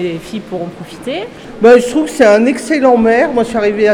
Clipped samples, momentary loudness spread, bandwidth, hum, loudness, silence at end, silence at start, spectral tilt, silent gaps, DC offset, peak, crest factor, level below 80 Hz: 0.3%; 15 LU; 13.5 kHz; none; -11 LUFS; 0 s; 0 s; -5 dB/octave; none; under 0.1%; 0 dBFS; 12 dB; -44 dBFS